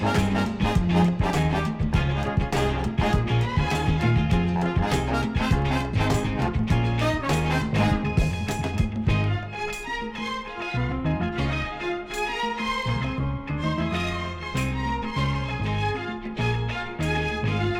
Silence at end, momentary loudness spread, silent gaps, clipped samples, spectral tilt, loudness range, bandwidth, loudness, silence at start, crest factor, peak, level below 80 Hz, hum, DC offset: 0 s; 7 LU; none; under 0.1%; -6.5 dB/octave; 4 LU; 16 kHz; -25 LUFS; 0 s; 16 dB; -8 dBFS; -34 dBFS; none; under 0.1%